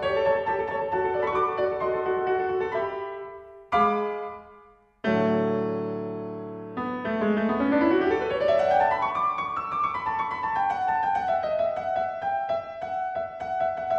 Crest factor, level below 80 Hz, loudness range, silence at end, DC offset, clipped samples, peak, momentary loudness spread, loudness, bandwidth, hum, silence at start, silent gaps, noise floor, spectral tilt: 14 dB; -58 dBFS; 4 LU; 0 s; under 0.1%; under 0.1%; -12 dBFS; 11 LU; -26 LUFS; 8 kHz; none; 0 s; none; -54 dBFS; -7.5 dB/octave